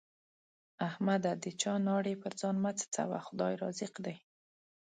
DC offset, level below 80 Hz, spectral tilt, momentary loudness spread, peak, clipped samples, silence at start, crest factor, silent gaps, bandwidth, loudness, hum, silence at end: under 0.1%; -80 dBFS; -5 dB/octave; 8 LU; -18 dBFS; under 0.1%; 0.8 s; 20 dB; none; 9.4 kHz; -36 LUFS; none; 0.65 s